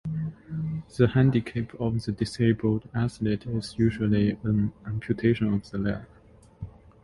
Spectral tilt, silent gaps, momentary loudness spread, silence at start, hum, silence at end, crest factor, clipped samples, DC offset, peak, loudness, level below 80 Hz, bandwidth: -8 dB/octave; none; 11 LU; 0.05 s; none; 0.35 s; 20 dB; under 0.1%; under 0.1%; -6 dBFS; -27 LUFS; -48 dBFS; 11.5 kHz